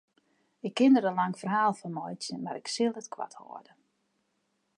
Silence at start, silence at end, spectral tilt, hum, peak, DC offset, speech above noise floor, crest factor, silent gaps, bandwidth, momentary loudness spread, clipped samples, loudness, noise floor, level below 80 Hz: 0.65 s; 1.2 s; -5 dB/octave; none; -12 dBFS; under 0.1%; 48 dB; 18 dB; none; 11.5 kHz; 18 LU; under 0.1%; -29 LUFS; -77 dBFS; -86 dBFS